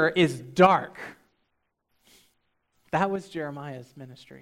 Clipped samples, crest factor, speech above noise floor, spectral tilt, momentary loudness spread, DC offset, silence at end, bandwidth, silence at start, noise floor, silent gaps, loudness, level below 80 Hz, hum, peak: under 0.1%; 24 dB; 51 dB; -6 dB/octave; 25 LU; under 0.1%; 0.25 s; 14 kHz; 0 s; -76 dBFS; none; -24 LUFS; -66 dBFS; none; -4 dBFS